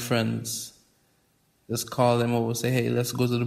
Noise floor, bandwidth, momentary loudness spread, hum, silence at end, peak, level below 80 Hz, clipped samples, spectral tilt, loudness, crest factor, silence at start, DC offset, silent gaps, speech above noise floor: -67 dBFS; 16 kHz; 10 LU; none; 0 s; -8 dBFS; -62 dBFS; under 0.1%; -5 dB/octave; -26 LUFS; 18 dB; 0 s; under 0.1%; none; 42 dB